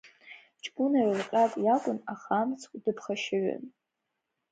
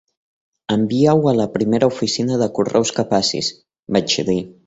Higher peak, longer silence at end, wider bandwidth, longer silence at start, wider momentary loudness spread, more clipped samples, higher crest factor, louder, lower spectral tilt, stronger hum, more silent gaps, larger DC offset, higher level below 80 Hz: second, -14 dBFS vs -2 dBFS; first, 0.8 s vs 0.15 s; first, 9.2 kHz vs 8.2 kHz; second, 0.05 s vs 0.7 s; first, 16 LU vs 7 LU; neither; about the same, 16 dB vs 16 dB; second, -29 LUFS vs -18 LUFS; about the same, -5.5 dB/octave vs -5 dB/octave; neither; neither; neither; second, -82 dBFS vs -52 dBFS